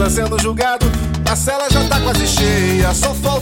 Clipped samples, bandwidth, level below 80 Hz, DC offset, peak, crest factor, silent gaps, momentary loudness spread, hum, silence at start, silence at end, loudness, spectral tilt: under 0.1%; 17 kHz; -22 dBFS; under 0.1%; 0 dBFS; 14 dB; none; 3 LU; none; 0 s; 0 s; -15 LUFS; -4 dB/octave